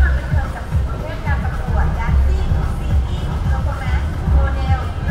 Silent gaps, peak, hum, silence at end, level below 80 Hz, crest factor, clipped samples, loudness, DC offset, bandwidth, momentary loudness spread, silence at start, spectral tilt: none; -4 dBFS; none; 0 s; -18 dBFS; 14 dB; under 0.1%; -20 LUFS; under 0.1%; 9.8 kHz; 4 LU; 0 s; -7.5 dB/octave